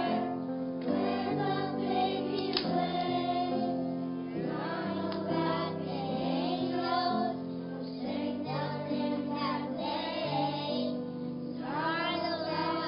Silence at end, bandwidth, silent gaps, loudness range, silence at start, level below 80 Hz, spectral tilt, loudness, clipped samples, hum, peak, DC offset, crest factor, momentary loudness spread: 0 s; 5.4 kHz; none; 2 LU; 0 s; -66 dBFS; -9.5 dB/octave; -33 LUFS; under 0.1%; none; -12 dBFS; under 0.1%; 20 dB; 5 LU